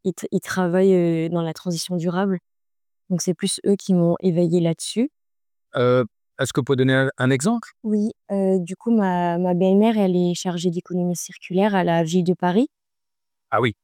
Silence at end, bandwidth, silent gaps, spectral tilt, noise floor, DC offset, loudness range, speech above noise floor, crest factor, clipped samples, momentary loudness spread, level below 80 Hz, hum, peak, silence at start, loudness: 0.1 s; 16.5 kHz; none; -6 dB/octave; under -90 dBFS; under 0.1%; 2 LU; over 70 dB; 16 dB; under 0.1%; 8 LU; -66 dBFS; none; -6 dBFS; 0.05 s; -21 LUFS